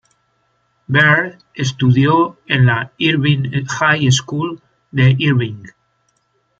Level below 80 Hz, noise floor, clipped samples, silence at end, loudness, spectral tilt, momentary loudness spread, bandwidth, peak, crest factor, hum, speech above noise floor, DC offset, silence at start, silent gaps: -52 dBFS; -63 dBFS; under 0.1%; 0.9 s; -15 LUFS; -5.5 dB/octave; 13 LU; 7.8 kHz; 0 dBFS; 16 dB; none; 49 dB; under 0.1%; 0.9 s; none